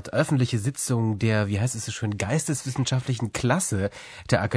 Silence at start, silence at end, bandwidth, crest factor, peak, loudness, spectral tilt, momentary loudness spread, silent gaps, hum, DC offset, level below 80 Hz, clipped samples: 0 s; 0 s; 11 kHz; 18 dB; -8 dBFS; -25 LUFS; -5 dB/octave; 5 LU; none; none; under 0.1%; -54 dBFS; under 0.1%